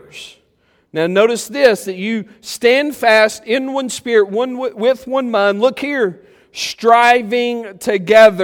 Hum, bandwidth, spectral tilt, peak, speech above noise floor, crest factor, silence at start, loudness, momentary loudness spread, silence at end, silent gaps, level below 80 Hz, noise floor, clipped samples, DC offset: none; 17.5 kHz; -3.5 dB/octave; 0 dBFS; 44 dB; 14 dB; 0.15 s; -15 LUFS; 12 LU; 0 s; none; -60 dBFS; -58 dBFS; under 0.1%; under 0.1%